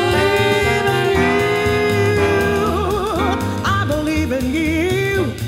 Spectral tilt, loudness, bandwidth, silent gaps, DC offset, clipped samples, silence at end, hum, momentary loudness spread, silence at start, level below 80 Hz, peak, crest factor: -5.5 dB/octave; -17 LUFS; 16 kHz; none; under 0.1%; under 0.1%; 0 s; none; 4 LU; 0 s; -32 dBFS; -4 dBFS; 14 dB